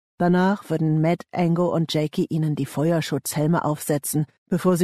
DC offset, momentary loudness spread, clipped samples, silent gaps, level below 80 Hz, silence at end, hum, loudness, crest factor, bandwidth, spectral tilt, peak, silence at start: under 0.1%; 4 LU; under 0.1%; 4.38-4.46 s; -62 dBFS; 0 s; none; -23 LUFS; 14 dB; 13.5 kHz; -6 dB/octave; -8 dBFS; 0.2 s